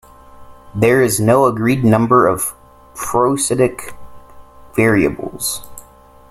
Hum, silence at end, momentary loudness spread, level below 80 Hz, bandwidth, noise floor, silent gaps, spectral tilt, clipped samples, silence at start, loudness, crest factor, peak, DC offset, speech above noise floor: none; 0.5 s; 15 LU; -44 dBFS; 16 kHz; -44 dBFS; none; -5.5 dB/octave; under 0.1%; 0.35 s; -15 LUFS; 16 dB; 0 dBFS; under 0.1%; 29 dB